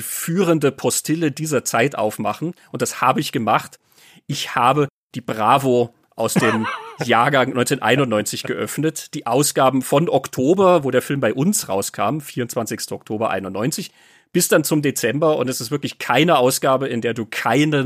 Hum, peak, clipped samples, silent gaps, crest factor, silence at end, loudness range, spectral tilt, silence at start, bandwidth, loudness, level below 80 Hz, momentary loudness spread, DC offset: none; -2 dBFS; under 0.1%; 4.90-5.10 s; 18 dB; 0 s; 3 LU; -4.5 dB/octave; 0 s; 15.5 kHz; -19 LUFS; -64 dBFS; 10 LU; under 0.1%